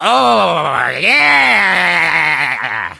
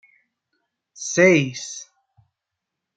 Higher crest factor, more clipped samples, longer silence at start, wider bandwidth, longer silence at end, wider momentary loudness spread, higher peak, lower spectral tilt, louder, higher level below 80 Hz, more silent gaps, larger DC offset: second, 12 dB vs 22 dB; neither; second, 0 s vs 1 s; first, 11 kHz vs 9.2 kHz; second, 0.05 s vs 1.15 s; second, 7 LU vs 18 LU; about the same, 0 dBFS vs -2 dBFS; second, -3 dB/octave vs -4.5 dB/octave; first, -11 LUFS vs -18 LUFS; first, -52 dBFS vs -68 dBFS; neither; neither